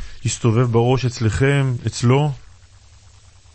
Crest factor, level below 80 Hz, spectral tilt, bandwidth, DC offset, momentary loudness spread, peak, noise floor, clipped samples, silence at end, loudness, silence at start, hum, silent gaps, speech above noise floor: 16 dB; -40 dBFS; -6 dB/octave; 8.8 kHz; 0.2%; 7 LU; -2 dBFS; -48 dBFS; under 0.1%; 1.1 s; -18 LUFS; 0 s; none; none; 30 dB